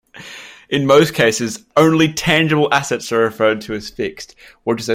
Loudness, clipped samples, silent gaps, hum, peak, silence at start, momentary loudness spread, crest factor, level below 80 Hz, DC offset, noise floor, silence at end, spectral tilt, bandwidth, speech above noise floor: -16 LUFS; under 0.1%; none; none; 0 dBFS; 0.15 s; 21 LU; 16 dB; -50 dBFS; under 0.1%; -37 dBFS; 0 s; -4.5 dB/octave; 16.5 kHz; 21 dB